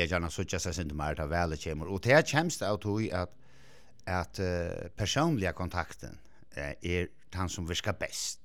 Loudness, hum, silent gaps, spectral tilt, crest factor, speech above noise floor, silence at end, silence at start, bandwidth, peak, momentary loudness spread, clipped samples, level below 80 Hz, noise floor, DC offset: -32 LUFS; none; none; -4.5 dB/octave; 24 dB; 28 dB; 0.1 s; 0 s; 17 kHz; -8 dBFS; 12 LU; under 0.1%; -50 dBFS; -59 dBFS; 0.3%